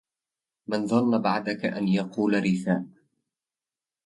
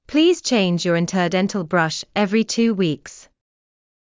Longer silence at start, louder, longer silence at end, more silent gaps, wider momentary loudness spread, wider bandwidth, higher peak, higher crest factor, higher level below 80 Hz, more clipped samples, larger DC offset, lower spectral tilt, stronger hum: first, 0.7 s vs 0.1 s; second, -26 LUFS vs -19 LUFS; first, 1.15 s vs 0.9 s; neither; first, 8 LU vs 5 LU; first, 11.5 kHz vs 7.6 kHz; second, -10 dBFS vs -4 dBFS; about the same, 18 dB vs 16 dB; second, -68 dBFS vs -60 dBFS; neither; neither; first, -7 dB/octave vs -5 dB/octave; neither